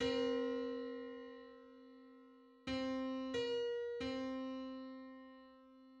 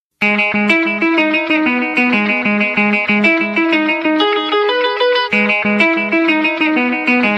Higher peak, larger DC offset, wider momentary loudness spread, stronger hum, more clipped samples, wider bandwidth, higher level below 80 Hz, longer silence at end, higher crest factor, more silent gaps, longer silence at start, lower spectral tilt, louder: second, -26 dBFS vs 0 dBFS; neither; first, 22 LU vs 2 LU; neither; neither; about the same, 8.6 kHz vs 8.4 kHz; second, -70 dBFS vs -62 dBFS; about the same, 0 s vs 0 s; about the same, 18 dB vs 14 dB; neither; second, 0 s vs 0.2 s; about the same, -5 dB/octave vs -5.5 dB/octave; second, -43 LUFS vs -13 LUFS